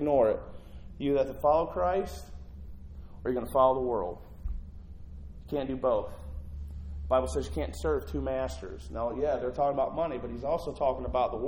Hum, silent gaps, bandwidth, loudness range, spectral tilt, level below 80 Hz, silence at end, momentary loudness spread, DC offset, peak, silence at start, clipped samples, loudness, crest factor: none; none; 17 kHz; 4 LU; -7 dB/octave; -42 dBFS; 0 s; 21 LU; under 0.1%; -12 dBFS; 0 s; under 0.1%; -30 LUFS; 20 dB